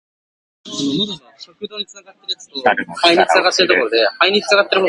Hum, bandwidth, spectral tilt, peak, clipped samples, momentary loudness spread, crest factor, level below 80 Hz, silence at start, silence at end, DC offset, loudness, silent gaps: none; 11.5 kHz; -3 dB/octave; 0 dBFS; under 0.1%; 17 LU; 18 dB; -62 dBFS; 0.65 s; 0 s; under 0.1%; -15 LUFS; none